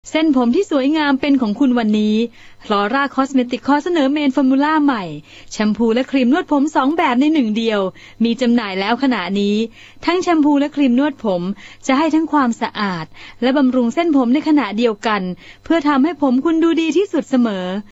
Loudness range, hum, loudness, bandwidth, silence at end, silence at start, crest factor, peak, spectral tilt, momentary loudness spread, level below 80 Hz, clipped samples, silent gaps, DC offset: 1 LU; none; -16 LUFS; 8 kHz; 0.1 s; 0.05 s; 14 dB; -2 dBFS; -5.5 dB/octave; 7 LU; -52 dBFS; under 0.1%; none; under 0.1%